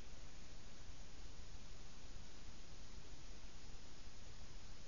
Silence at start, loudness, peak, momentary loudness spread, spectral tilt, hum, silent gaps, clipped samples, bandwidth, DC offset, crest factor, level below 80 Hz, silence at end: 0 s; -59 LUFS; -36 dBFS; 1 LU; -3.5 dB/octave; none; none; under 0.1%; 7.2 kHz; 0.6%; 14 dB; -58 dBFS; 0 s